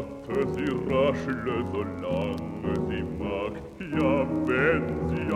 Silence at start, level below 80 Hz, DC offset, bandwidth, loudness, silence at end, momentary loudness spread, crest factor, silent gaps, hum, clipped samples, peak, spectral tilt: 0 s; -46 dBFS; under 0.1%; 12 kHz; -28 LUFS; 0 s; 7 LU; 16 dB; none; none; under 0.1%; -10 dBFS; -7.5 dB/octave